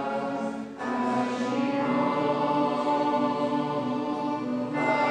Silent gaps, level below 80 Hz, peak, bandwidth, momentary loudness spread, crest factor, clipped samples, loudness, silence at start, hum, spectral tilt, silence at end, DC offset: none; -78 dBFS; -14 dBFS; 9.6 kHz; 5 LU; 14 dB; under 0.1%; -27 LUFS; 0 s; none; -6.5 dB/octave; 0 s; under 0.1%